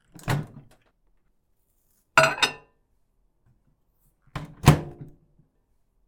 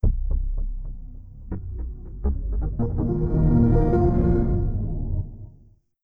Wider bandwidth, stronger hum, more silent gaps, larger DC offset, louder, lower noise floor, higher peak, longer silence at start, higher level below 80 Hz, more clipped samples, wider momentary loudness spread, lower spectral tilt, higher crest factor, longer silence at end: first, 18 kHz vs 2.5 kHz; neither; neither; neither; about the same, -23 LUFS vs -24 LUFS; first, -68 dBFS vs -53 dBFS; first, -2 dBFS vs -6 dBFS; first, 0.25 s vs 0.05 s; second, -48 dBFS vs -26 dBFS; neither; first, 21 LU vs 18 LU; second, -4.5 dB/octave vs -12.5 dB/octave; first, 26 dB vs 16 dB; first, 1.05 s vs 0.55 s